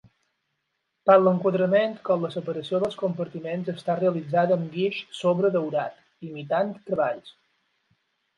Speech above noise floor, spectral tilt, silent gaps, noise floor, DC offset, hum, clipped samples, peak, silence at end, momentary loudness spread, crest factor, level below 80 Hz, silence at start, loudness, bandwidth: 54 dB; -7.5 dB/octave; none; -78 dBFS; under 0.1%; none; under 0.1%; -4 dBFS; 1.05 s; 11 LU; 20 dB; -72 dBFS; 1.05 s; -25 LUFS; 10.5 kHz